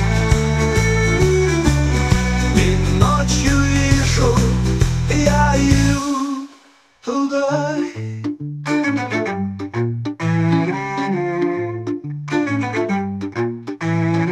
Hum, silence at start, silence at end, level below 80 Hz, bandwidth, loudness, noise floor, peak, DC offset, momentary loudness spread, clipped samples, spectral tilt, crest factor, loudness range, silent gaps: none; 0 s; 0 s; -26 dBFS; 14.5 kHz; -18 LUFS; -50 dBFS; 0 dBFS; under 0.1%; 10 LU; under 0.1%; -5.5 dB/octave; 18 dB; 6 LU; none